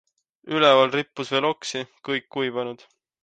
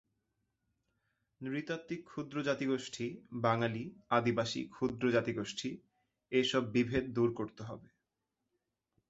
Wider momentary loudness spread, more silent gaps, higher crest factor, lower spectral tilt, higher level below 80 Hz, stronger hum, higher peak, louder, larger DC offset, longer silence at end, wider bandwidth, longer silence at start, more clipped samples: first, 15 LU vs 12 LU; neither; about the same, 20 dB vs 22 dB; second, -4 dB/octave vs -5.5 dB/octave; second, -72 dBFS vs -66 dBFS; neither; first, -4 dBFS vs -14 dBFS; first, -23 LUFS vs -35 LUFS; neither; second, 0.5 s vs 1.25 s; first, 9.2 kHz vs 8 kHz; second, 0.45 s vs 1.4 s; neither